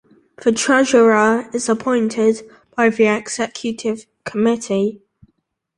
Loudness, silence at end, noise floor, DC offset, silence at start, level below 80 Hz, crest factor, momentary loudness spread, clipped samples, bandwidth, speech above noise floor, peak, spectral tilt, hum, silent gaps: -17 LUFS; 0.8 s; -67 dBFS; under 0.1%; 0.4 s; -60 dBFS; 16 dB; 12 LU; under 0.1%; 11.5 kHz; 51 dB; -2 dBFS; -4 dB/octave; none; none